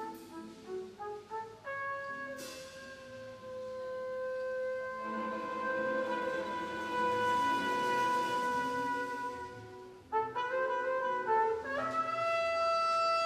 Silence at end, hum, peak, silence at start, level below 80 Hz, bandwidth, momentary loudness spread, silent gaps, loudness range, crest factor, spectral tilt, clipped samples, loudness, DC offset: 0 s; none; -20 dBFS; 0 s; -72 dBFS; 15.5 kHz; 16 LU; none; 9 LU; 16 dB; -3.5 dB/octave; under 0.1%; -35 LUFS; under 0.1%